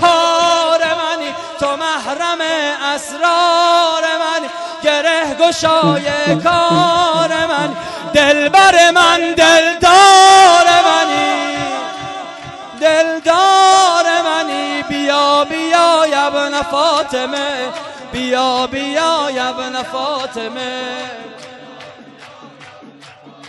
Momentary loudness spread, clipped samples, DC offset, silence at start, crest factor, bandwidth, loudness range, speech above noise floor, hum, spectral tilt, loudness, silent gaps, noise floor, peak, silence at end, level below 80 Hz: 15 LU; under 0.1%; under 0.1%; 0 s; 14 dB; 11.5 kHz; 10 LU; 26 dB; none; -2.5 dB/octave; -12 LUFS; none; -39 dBFS; 0 dBFS; 0 s; -50 dBFS